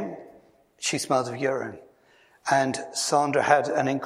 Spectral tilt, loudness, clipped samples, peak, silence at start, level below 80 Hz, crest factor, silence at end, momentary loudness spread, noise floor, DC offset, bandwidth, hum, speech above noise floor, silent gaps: -3.5 dB/octave; -25 LUFS; under 0.1%; -4 dBFS; 0 s; -72 dBFS; 24 dB; 0 s; 14 LU; -59 dBFS; under 0.1%; 15 kHz; none; 35 dB; none